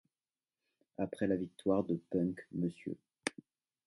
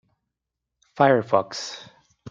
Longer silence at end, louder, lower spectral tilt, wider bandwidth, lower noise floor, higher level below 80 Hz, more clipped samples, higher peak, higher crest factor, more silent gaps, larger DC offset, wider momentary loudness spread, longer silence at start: first, 0.55 s vs 0 s; second, -37 LUFS vs -22 LUFS; first, -6.5 dB/octave vs -5 dB/octave; first, 11.5 kHz vs 7.6 kHz; first, under -90 dBFS vs -84 dBFS; about the same, -68 dBFS vs -70 dBFS; neither; second, -14 dBFS vs -4 dBFS; about the same, 24 dB vs 22 dB; neither; neither; second, 9 LU vs 16 LU; about the same, 1 s vs 0.95 s